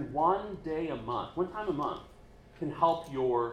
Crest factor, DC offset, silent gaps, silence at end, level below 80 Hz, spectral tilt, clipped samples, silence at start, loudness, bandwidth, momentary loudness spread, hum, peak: 20 dB; under 0.1%; none; 0 s; -56 dBFS; -7.5 dB/octave; under 0.1%; 0 s; -32 LUFS; 10 kHz; 9 LU; none; -14 dBFS